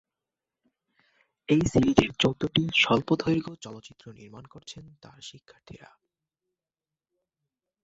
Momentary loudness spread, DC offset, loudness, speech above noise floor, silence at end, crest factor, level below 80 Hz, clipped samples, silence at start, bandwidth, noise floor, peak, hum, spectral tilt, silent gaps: 24 LU; under 0.1%; -24 LUFS; over 63 dB; 2.1 s; 28 dB; -52 dBFS; under 0.1%; 1.5 s; 8 kHz; under -90 dBFS; -2 dBFS; none; -5.5 dB/octave; none